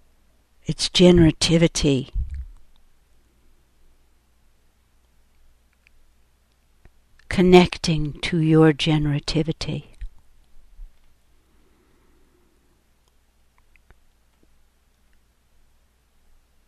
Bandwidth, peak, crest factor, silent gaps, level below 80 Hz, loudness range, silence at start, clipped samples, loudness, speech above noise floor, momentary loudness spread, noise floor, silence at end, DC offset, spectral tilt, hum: 12 kHz; 0 dBFS; 24 dB; none; -38 dBFS; 15 LU; 0.7 s; under 0.1%; -19 LUFS; 43 dB; 19 LU; -61 dBFS; 5.8 s; under 0.1%; -5.5 dB/octave; none